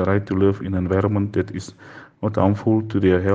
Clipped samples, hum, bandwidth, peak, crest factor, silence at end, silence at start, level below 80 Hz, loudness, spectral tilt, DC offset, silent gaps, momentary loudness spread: under 0.1%; none; 7.8 kHz; -2 dBFS; 18 dB; 0 s; 0 s; -54 dBFS; -21 LUFS; -8.5 dB/octave; under 0.1%; none; 10 LU